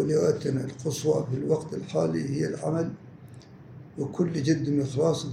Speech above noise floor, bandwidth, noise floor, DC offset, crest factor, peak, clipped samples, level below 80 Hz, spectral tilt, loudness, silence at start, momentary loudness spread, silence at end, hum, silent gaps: 20 dB; 15.5 kHz; -47 dBFS; under 0.1%; 16 dB; -10 dBFS; under 0.1%; -62 dBFS; -6.5 dB/octave; -28 LUFS; 0 s; 22 LU; 0 s; none; none